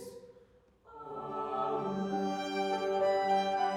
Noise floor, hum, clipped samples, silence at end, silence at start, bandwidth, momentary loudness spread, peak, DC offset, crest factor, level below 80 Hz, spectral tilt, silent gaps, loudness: -63 dBFS; none; under 0.1%; 0 s; 0 s; 14.5 kHz; 16 LU; -20 dBFS; under 0.1%; 14 dB; -72 dBFS; -5.5 dB/octave; none; -33 LUFS